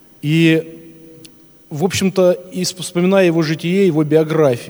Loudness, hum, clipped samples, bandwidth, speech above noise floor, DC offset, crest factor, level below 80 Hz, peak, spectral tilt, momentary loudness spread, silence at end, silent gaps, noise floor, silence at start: -15 LUFS; none; under 0.1%; over 20 kHz; 29 dB; under 0.1%; 16 dB; -60 dBFS; 0 dBFS; -6 dB/octave; 8 LU; 0 s; none; -43 dBFS; 0.25 s